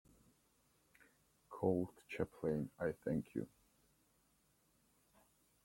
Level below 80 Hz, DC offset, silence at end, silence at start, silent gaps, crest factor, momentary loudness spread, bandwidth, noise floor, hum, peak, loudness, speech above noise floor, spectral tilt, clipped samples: -72 dBFS; under 0.1%; 2.2 s; 1.5 s; none; 24 dB; 9 LU; 16.5 kHz; -77 dBFS; none; -22 dBFS; -42 LUFS; 36 dB; -8 dB/octave; under 0.1%